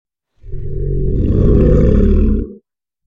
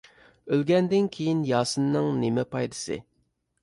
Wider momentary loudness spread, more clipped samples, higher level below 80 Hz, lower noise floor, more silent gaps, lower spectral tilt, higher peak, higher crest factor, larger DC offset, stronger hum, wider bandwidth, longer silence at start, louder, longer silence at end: first, 18 LU vs 9 LU; neither; first, -16 dBFS vs -62 dBFS; second, -50 dBFS vs -72 dBFS; neither; first, -11.5 dB/octave vs -6 dB/octave; first, 0 dBFS vs -10 dBFS; about the same, 12 dB vs 16 dB; neither; neither; second, 3.7 kHz vs 11.5 kHz; second, 0.05 s vs 0.45 s; first, -14 LUFS vs -26 LUFS; second, 0.05 s vs 0.6 s